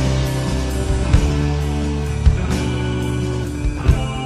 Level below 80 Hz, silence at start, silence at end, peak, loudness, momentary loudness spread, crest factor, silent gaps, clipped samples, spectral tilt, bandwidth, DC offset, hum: -20 dBFS; 0 s; 0 s; 0 dBFS; -20 LUFS; 5 LU; 18 dB; none; under 0.1%; -6.5 dB/octave; 13.5 kHz; under 0.1%; none